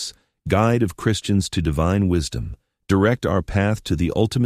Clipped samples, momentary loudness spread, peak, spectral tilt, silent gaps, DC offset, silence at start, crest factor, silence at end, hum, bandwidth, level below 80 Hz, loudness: under 0.1%; 10 LU; -4 dBFS; -6 dB/octave; none; under 0.1%; 0 s; 16 dB; 0 s; none; 15 kHz; -36 dBFS; -21 LUFS